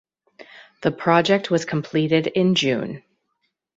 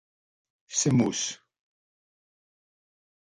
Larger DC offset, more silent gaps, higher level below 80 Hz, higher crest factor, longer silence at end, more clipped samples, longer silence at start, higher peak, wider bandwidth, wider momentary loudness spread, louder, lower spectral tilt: neither; neither; about the same, -62 dBFS vs -64 dBFS; about the same, 20 dB vs 20 dB; second, 0.8 s vs 1.9 s; neither; second, 0.4 s vs 0.7 s; first, -2 dBFS vs -12 dBFS; second, 8 kHz vs 11.5 kHz; about the same, 9 LU vs 11 LU; first, -20 LUFS vs -26 LUFS; first, -5.5 dB/octave vs -4 dB/octave